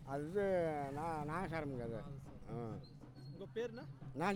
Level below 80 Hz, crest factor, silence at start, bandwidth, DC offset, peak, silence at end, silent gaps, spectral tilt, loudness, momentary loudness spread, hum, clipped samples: -62 dBFS; 16 dB; 0 s; 19 kHz; under 0.1%; -26 dBFS; 0 s; none; -7 dB/octave; -43 LUFS; 15 LU; none; under 0.1%